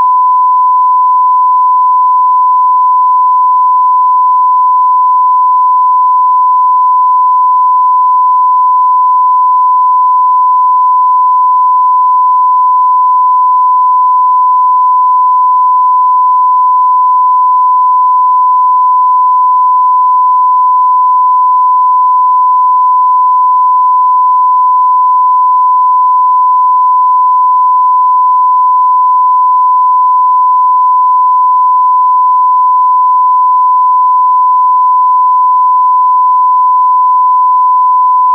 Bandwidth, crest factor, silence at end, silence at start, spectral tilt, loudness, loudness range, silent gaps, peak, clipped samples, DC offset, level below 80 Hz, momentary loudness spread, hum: 1.2 kHz; 4 dB; 0 s; 0 s; -4 dB/octave; -7 LUFS; 0 LU; none; -2 dBFS; under 0.1%; under 0.1%; under -90 dBFS; 0 LU; none